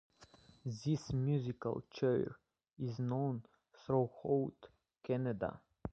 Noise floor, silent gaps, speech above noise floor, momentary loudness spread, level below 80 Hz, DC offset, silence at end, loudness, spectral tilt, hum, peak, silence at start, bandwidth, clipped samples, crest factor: -64 dBFS; none; 27 dB; 11 LU; -64 dBFS; under 0.1%; 0 s; -39 LUFS; -8 dB/octave; none; -20 dBFS; 0.2 s; 8 kHz; under 0.1%; 18 dB